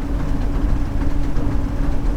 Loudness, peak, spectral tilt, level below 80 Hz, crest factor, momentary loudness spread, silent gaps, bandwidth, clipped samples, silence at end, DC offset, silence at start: -24 LUFS; -6 dBFS; -8 dB/octave; -20 dBFS; 12 dB; 1 LU; none; 7.8 kHz; under 0.1%; 0 s; under 0.1%; 0 s